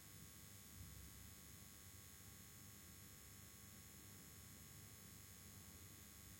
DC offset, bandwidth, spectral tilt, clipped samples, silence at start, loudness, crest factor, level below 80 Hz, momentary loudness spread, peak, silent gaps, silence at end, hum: under 0.1%; 16.5 kHz; -3 dB/octave; under 0.1%; 0 s; -59 LUFS; 14 dB; -72 dBFS; 1 LU; -46 dBFS; none; 0 s; none